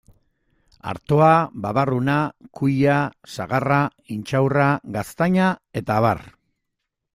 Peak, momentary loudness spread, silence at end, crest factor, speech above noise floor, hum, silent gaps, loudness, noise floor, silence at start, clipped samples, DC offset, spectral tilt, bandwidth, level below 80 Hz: -4 dBFS; 12 LU; 0.85 s; 18 dB; 59 dB; none; none; -20 LUFS; -79 dBFS; 0.85 s; under 0.1%; under 0.1%; -7.5 dB/octave; 15 kHz; -54 dBFS